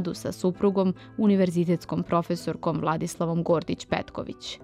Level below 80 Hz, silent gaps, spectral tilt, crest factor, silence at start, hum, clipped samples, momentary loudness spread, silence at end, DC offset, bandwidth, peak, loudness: -56 dBFS; none; -7 dB/octave; 16 dB; 0 s; none; under 0.1%; 7 LU; 0 s; under 0.1%; 14.5 kHz; -10 dBFS; -26 LUFS